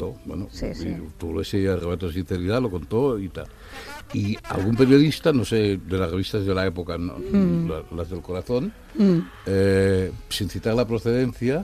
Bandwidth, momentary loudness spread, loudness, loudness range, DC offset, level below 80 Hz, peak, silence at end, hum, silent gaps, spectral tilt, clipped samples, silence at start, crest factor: 14.5 kHz; 13 LU; -23 LUFS; 5 LU; under 0.1%; -42 dBFS; -4 dBFS; 0 s; none; none; -7 dB/octave; under 0.1%; 0 s; 20 dB